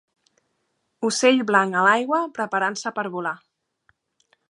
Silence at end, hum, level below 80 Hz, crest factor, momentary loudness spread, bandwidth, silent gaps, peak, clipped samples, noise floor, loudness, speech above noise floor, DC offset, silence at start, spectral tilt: 1.15 s; none; -78 dBFS; 22 dB; 11 LU; 11.5 kHz; none; -2 dBFS; under 0.1%; -73 dBFS; -21 LUFS; 52 dB; under 0.1%; 1 s; -3.5 dB/octave